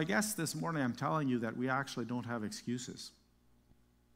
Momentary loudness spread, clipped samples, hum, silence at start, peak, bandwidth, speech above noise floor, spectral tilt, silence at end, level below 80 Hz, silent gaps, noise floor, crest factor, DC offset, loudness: 8 LU; under 0.1%; 60 Hz at -55 dBFS; 0 s; -18 dBFS; 16 kHz; 32 dB; -4.5 dB/octave; 1.05 s; -70 dBFS; none; -69 dBFS; 20 dB; under 0.1%; -37 LUFS